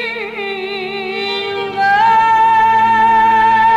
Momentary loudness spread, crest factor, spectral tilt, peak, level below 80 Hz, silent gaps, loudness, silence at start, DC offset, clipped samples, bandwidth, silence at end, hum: 11 LU; 8 dB; -4 dB/octave; -4 dBFS; -48 dBFS; none; -13 LUFS; 0 s; under 0.1%; under 0.1%; 8 kHz; 0 s; none